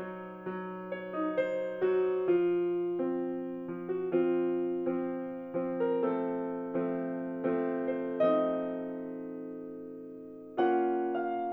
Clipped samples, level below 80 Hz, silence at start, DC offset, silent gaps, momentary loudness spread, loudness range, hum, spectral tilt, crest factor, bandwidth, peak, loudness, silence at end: under 0.1%; -76 dBFS; 0 s; under 0.1%; none; 13 LU; 2 LU; none; -9.5 dB/octave; 16 dB; 4 kHz; -16 dBFS; -32 LUFS; 0 s